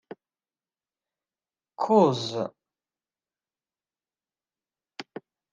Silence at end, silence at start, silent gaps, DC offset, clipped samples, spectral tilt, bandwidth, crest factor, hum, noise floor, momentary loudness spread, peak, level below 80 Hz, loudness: 0.35 s; 1.8 s; none; under 0.1%; under 0.1%; -6.5 dB/octave; 9.6 kHz; 24 dB; none; under -90 dBFS; 24 LU; -6 dBFS; -78 dBFS; -24 LUFS